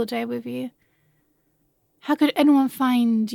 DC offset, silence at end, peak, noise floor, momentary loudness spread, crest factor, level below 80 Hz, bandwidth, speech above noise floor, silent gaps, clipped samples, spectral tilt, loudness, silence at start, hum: under 0.1%; 0 s; -8 dBFS; -67 dBFS; 15 LU; 16 dB; -74 dBFS; 17 kHz; 47 dB; none; under 0.1%; -5.5 dB/octave; -21 LUFS; 0 s; none